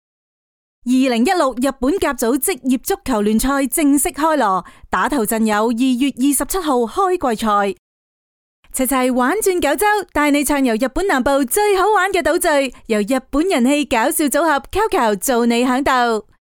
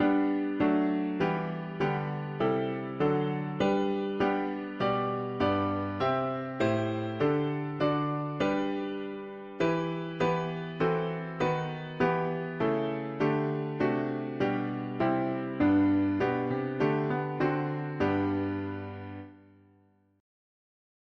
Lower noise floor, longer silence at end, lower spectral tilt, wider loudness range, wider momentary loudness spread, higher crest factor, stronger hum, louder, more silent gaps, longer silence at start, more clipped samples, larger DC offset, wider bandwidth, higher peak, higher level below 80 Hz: first, under -90 dBFS vs -65 dBFS; second, 0.25 s vs 1.85 s; second, -3.5 dB/octave vs -8 dB/octave; about the same, 3 LU vs 3 LU; second, 4 LU vs 7 LU; about the same, 14 dB vs 16 dB; neither; first, -17 LUFS vs -30 LUFS; first, 7.79-8.63 s vs none; first, 0.85 s vs 0 s; neither; neither; first, 19 kHz vs 7.4 kHz; first, -4 dBFS vs -14 dBFS; first, -40 dBFS vs -62 dBFS